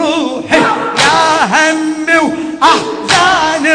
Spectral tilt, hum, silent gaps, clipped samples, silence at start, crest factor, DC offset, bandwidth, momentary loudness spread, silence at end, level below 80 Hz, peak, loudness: -2.5 dB/octave; none; none; 0.5%; 0 s; 10 dB; under 0.1%; 11 kHz; 5 LU; 0 s; -46 dBFS; 0 dBFS; -10 LUFS